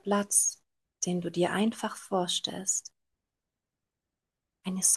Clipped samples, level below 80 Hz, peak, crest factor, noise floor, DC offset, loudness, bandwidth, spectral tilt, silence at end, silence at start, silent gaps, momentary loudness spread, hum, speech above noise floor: under 0.1%; -78 dBFS; -10 dBFS; 20 dB; -88 dBFS; under 0.1%; -29 LUFS; 12.5 kHz; -3 dB/octave; 0 s; 0.05 s; none; 11 LU; none; 59 dB